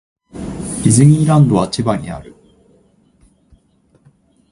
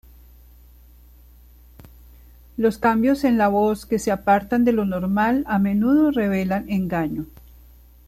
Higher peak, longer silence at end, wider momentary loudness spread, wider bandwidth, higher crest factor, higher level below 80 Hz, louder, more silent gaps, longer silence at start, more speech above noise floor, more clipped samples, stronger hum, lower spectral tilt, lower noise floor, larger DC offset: first, 0 dBFS vs -6 dBFS; first, 2.25 s vs 0.85 s; first, 20 LU vs 6 LU; second, 11.5 kHz vs 14 kHz; about the same, 16 dB vs 16 dB; about the same, -42 dBFS vs -46 dBFS; first, -13 LUFS vs -20 LUFS; neither; second, 0.35 s vs 2.55 s; first, 43 dB vs 29 dB; neither; second, none vs 60 Hz at -40 dBFS; about the same, -6.5 dB/octave vs -7 dB/octave; first, -55 dBFS vs -48 dBFS; neither